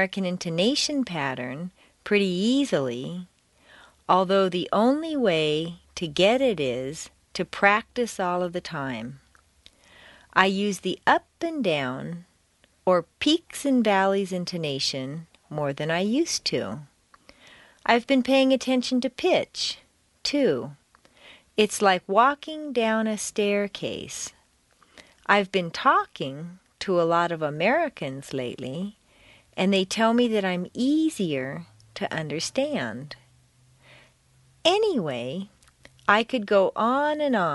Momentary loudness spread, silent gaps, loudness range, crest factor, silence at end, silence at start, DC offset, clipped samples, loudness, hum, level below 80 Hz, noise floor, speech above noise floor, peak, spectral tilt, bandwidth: 14 LU; none; 4 LU; 24 dB; 0 s; 0 s; under 0.1%; under 0.1%; -24 LUFS; none; -62 dBFS; -63 dBFS; 39 dB; -2 dBFS; -4.5 dB/octave; 11.5 kHz